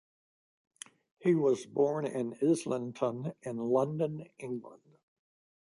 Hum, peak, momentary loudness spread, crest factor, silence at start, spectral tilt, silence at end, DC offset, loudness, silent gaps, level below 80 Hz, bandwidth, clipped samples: none; -16 dBFS; 14 LU; 18 dB; 1.2 s; -7 dB/octave; 0.95 s; under 0.1%; -32 LUFS; none; -78 dBFS; 11.5 kHz; under 0.1%